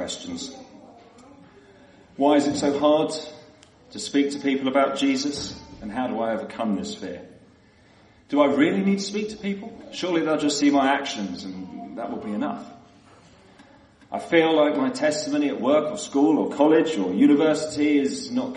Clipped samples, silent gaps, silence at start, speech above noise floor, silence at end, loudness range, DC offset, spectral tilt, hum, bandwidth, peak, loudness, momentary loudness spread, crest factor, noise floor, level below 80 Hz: under 0.1%; none; 0 s; 32 dB; 0 s; 7 LU; under 0.1%; -4.5 dB/octave; none; 10.5 kHz; -4 dBFS; -23 LUFS; 16 LU; 18 dB; -55 dBFS; -62 dBFS